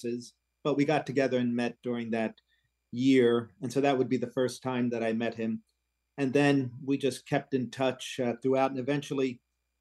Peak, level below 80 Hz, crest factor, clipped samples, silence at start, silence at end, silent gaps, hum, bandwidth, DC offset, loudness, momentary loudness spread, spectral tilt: -12 dBFS; -76 dBFS; 16 dB; under 0.1%; 0 s; 0.45 s; none; none; 12.5 kHz; under 0.1%; -30 LUFS; 10 LU; -6 dB/octave